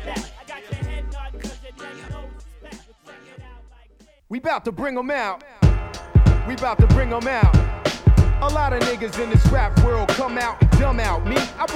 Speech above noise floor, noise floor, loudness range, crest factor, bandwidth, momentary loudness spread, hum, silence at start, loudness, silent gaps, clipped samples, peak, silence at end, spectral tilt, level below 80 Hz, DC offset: 34 dB; -52 dBFS; 17 LU; 18 dB; 13 kHz; 19 LU; none; 0 s; -20 LUFS; none; under 0.1%; -2 dBFS; 0 s; -6.5 dB/octave; -24 dBFS; under 0.1%